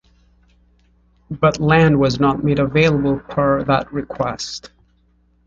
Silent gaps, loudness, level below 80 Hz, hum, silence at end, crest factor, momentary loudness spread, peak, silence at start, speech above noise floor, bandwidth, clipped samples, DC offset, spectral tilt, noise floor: none; -17 LUFS; -42 dBFS; 60 Hz at -35 dBFS; 0.8 s; 18 dB; 13 LU; -2 dBFS; 1.3 s; 41 dB; 7.6 kHz; under 0.1%; under 0.1%; -6.5 dB/octave; -58 dBFS